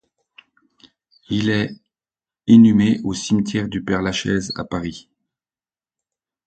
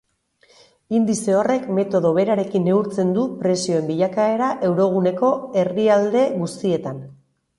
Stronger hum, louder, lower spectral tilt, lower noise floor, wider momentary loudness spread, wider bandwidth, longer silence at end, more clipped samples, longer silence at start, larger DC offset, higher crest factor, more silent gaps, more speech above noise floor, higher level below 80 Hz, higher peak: neither; about the same, -18 LUFS vs -20 LUFS; about the same, -6 dB/octave vs -6.5 dB/octave; first, under -90 dBFS vs -59 dBFS; first, 15 LU vs 6 LU; second, 9 kHz vs 11.5 kHz; first, 1.5 s vs 0.45 s; neither; first, 1.3 s vs 0.9 s; neither; about the same, 18 dB vs 16 dB; neither; first, over 73 dB vs 40 dB; first, -48 dBFS vs -64 dBFS; about the same, -2 dBFS vs -4 dBFS